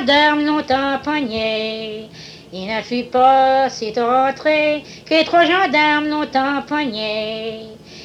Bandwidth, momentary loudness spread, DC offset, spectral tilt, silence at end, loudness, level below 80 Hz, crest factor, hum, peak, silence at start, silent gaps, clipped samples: 10 kHz; 16 LU; under 0.1%; -4 dB/octave; 0 s; -17 LUFS; -54 dBFS; 16 dB; none; -2 dBFS; 0 s; none; under 0.1%